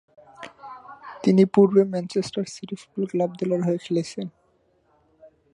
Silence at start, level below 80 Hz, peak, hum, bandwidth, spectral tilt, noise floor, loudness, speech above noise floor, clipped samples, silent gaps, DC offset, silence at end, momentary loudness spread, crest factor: 0.4 s; -68 dBFS; -4 dBFS; none; 10.5 kHz; -7 dB/octave; -65 dBFS; -23 LUFS; 43 dB; under 0.1%; none; under 0.1%; 1.25 s; 24 LU; 20 dB